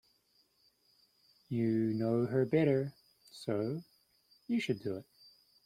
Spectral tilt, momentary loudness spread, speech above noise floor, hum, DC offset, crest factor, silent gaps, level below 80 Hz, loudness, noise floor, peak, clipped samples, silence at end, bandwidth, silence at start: -8 dB/octave; 14 LU; 40 dB; none; under 0.1%; 18 dB; none; -74 dBFS; -34 LUFS; -73 dBFS; -18 dBFS; under 0.1%; 0.65 s; 15 kHz; 1.5 s